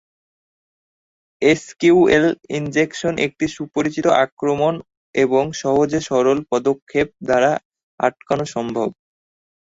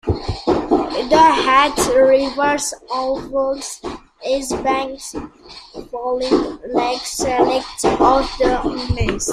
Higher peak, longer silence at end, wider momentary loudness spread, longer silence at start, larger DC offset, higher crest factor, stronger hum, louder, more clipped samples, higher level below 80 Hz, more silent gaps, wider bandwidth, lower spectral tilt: about the same, -2 dBFS vs 0 dBFS; first, 0.8 s vs 0 s; second, 8 LU vs 16 LU; first, 1.4 s vs 0.05 s; neither; about the same, 18 dB vs 16 dB; neither; about the same, -19 LUFS vs -17 LUFS; neither; second, -54 dBFS vs -36 dBFS; first, 4.32-4.37 s, 4.97-5.13 s, 6.82-6.87 s, 7.65-7.71 s, 7.83-7.98 s vs none; second, 8 kHz vs 15 kHz; first, -5.5 dB/octave vs -4 dB/octave